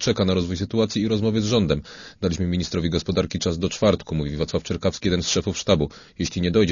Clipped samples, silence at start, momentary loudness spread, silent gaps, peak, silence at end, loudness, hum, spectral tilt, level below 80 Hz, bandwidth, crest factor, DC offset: under 0.1%; 0 s; 6 LU; none; -4 dBFS; 0 s; -23 LUFS; none; -5.5 dB/octave; -40 dBFS; 7.4 kHz; 18 dB; under 0.1%